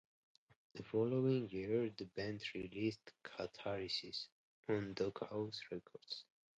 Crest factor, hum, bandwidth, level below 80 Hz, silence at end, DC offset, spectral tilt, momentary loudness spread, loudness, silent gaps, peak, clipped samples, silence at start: 18 dB; none; 9 kHz; -74 dBFS; 0.35 s; under 0.1%; -6.5 dB/octave; 14 LU; -42 LUFS; 4.32-4.63 s; -24 dBFS; under 0.1%; 0.75 s